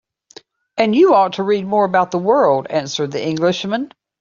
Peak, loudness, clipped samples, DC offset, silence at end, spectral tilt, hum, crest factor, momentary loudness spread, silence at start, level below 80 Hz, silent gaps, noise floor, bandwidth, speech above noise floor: -2 dBFS; -16 LUFS; under 0.1%; under 0.1%; 0.35 s; -5.5 dB/octave; none; 16 dB; 10 LU; 0.75 s; -62 dBFS; none; -45 dBFS; 7.4 kHz; 29 dB